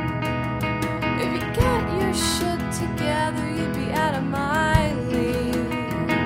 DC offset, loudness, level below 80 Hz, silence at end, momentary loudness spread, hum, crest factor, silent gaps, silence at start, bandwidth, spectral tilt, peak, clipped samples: under 0.1%; -23 LUFS; -36 dBFS; 0 s; 4 LU; none; 20 dB; none; 0 s; 16 kHz; -5 dB/octave; -4 dBFS; under 0.1%